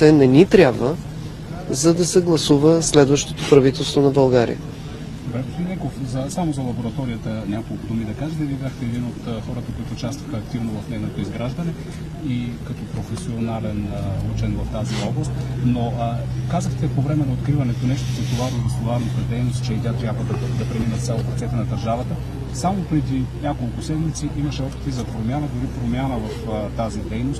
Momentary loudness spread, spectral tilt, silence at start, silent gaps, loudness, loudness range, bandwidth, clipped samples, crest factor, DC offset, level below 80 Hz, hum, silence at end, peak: 13 LU; -6 dB/octave; 0 s; none; -21 LUFS; 10 LU; 13 kHz; under 0.1%; 20 dB; under 0.1%; -36 dBFS; none; 0 s; 0 dBFS